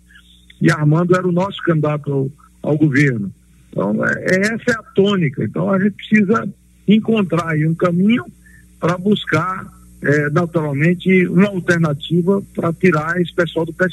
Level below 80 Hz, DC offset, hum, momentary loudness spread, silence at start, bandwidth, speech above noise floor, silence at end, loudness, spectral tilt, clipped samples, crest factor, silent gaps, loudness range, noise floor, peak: -50 dBFS; under 0.1%; none; 8 LU; 0.6 s; 12.5 kHz; 31 dB; 0 s; -17 LUFS; -7 dB/octave; under 0.1%; 16 dB; none; 2 LU; -47 dBFS; 0 dBFS